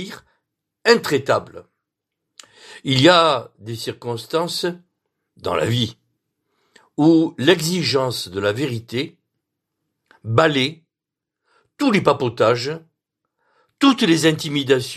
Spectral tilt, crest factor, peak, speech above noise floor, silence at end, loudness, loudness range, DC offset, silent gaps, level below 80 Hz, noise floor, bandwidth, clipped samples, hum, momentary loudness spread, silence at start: -5 dB/octave; 20 dB; 0 dBFS; 67 dB; 0 s; -18 LUFS; 5 LU; under 0.1%; none; -60 dBFS; -85 dBFS; 14.5 kHz; under 0.1%; none; 14 LU; 0 s